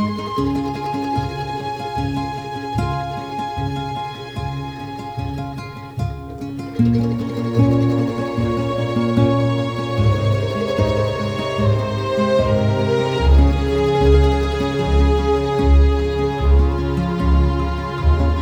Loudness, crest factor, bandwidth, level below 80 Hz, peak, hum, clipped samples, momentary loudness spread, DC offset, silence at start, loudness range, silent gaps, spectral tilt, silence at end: -19 LUFS; 16 dB; 9 kHz; -22 dBFS; -2 dBFS; none; under 0.1%; 11 LU; under 0.1%; 0 s; 9 LU; none; -7.5 dB/octave; 0 s